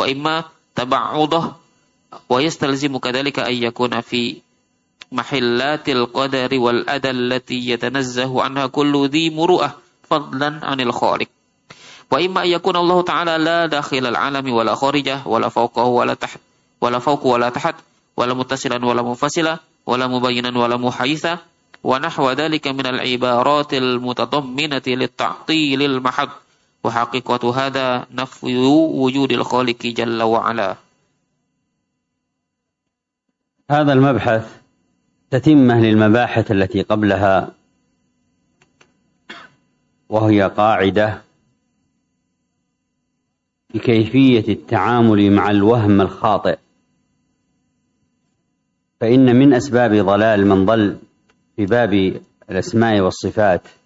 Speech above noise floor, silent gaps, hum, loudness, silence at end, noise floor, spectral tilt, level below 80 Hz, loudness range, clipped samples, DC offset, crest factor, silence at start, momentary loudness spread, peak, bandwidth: 62 dB; none; none; -17 LUFS; 0.25 s; -79 dBFS; -6 dB/octave; -56 dBFS; 6 LU; under 0.1%; under 0.1%; 16 dB; 0 s; 10 LU; -2 dBFS; 8 kHz